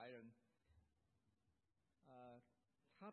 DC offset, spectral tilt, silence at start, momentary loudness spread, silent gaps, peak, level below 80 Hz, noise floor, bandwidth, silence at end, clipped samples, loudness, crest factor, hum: under 0.1%; -4.5 dB/octave; 0 s; 8 LU; none; -46 dBFS; under -90 dBFS; -89 dBFS; 4.2 kHz; 0 s; under 0.1%; -64 LUFS; 20 dB; none